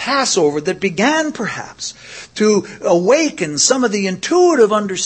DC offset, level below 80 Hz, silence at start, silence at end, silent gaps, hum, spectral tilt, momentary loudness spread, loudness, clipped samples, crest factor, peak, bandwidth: under 0.1%; -58 dBFS; 0 s; 0 s; none; none; -3.5 dB/octave; 13 LU; -15 LUFS; under 0.1%; 16 dB; 0 dBFS; 8.8 kHz